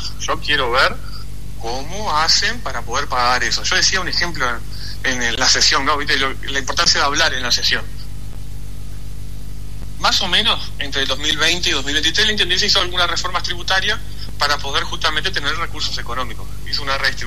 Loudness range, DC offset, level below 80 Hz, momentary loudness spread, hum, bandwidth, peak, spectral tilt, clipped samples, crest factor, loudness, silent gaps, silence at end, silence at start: 5 LU; 7%; -32 dBFS; 20 LU; 50 Hz at -30 dBFS; 13.5 kHz; 0 dBFS; -1.5 dB/octave; under 0.1%; 18 dB; -17 LUFS; none; 0 s; 0 s